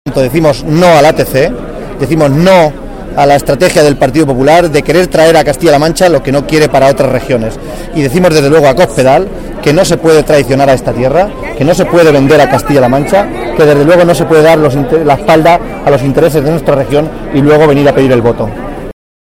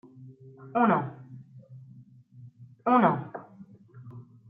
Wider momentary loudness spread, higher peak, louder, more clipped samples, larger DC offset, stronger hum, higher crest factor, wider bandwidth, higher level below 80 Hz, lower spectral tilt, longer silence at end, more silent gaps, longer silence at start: second, 8 LU vs 27 LU; first, 0 dBFS vs -10 dBFS; first, -7 LUFS vs -26 LUFS; first, 0.3% vs under 0.1%; first, 0.3% vs under 0.1%; neither; second, 8 dB vs 22 dB; first, 17 kHz vs 4.7 kHz; first, -26 dBFS vs -74 dBFS; second, -6 dB/octave vs -10.5 dB/octave; about the same, 0.4 s vs 0.3 s; neither; second, 0.05 s vs 0.2 s